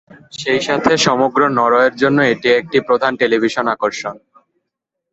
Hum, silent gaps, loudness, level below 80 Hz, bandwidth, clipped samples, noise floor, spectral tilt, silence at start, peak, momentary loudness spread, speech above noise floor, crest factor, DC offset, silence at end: none; none; -15 LUFS; -54 dBFS; 8.2 kHz; under 0.1%; -78 dBFS; -4 dB/octave; 0.35 s; 0 dBFS; 8 LU; 63 dB; 16 dB; under 0.1%; 0.95 s